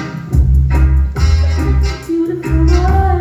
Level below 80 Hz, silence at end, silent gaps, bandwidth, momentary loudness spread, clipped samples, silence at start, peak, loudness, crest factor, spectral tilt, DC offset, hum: -14 dBFS; 0 s; none; 8 kHz; 5 LU; under 0.1%; 0 s; 0 dBFS; -14 LUFS; 12 dB; -7.5 dB/octave; under 0.1%; none